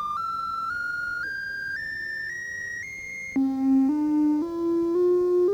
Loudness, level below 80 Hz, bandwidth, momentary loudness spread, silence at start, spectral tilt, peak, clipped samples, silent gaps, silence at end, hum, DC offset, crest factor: -26 LUFS; -60 dBFS; 9.4 kHz; 10 LU; 0 s; -5.5 dB/octave; -14 dBFS; under 0.1%; none; 0 s; none; under 0.1%; 12 dB